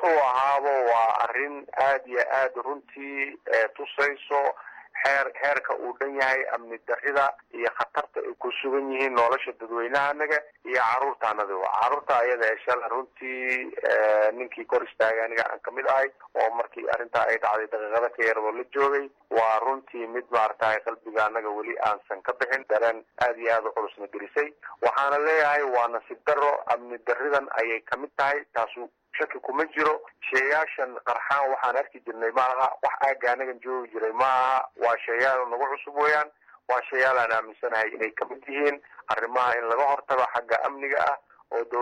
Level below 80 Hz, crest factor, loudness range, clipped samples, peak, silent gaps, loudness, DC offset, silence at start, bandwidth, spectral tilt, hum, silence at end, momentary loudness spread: -72 dBFS; 14 dB; 2 LU; under 0.1%; -12 dBFS; none; -26 LUFS; under 0.1%; 0 s; 11 kHz; -3.5 dB/octave; none; 0 s; 9 LU